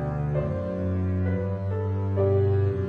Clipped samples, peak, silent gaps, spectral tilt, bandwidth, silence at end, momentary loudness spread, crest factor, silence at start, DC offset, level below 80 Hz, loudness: under 0.1%; -12 dBFS; none; -11 dB/octave; 3.7 kHz; 0 s; 6 LU; 12 dB; 0 s; under 0.1%; -44 dBFS; -26 LUFS